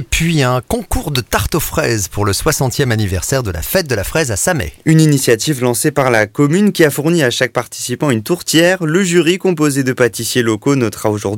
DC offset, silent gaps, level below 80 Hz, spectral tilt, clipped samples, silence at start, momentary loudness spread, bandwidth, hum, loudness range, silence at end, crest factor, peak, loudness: under 0.1%; none; -32 dBFS; -4.5 dB/octave; under 0.1%; 0 s; 6 LU; 17 kHz; none; 3 LU; 0 s; 14 dB; 0 dBFS; -14 LUFS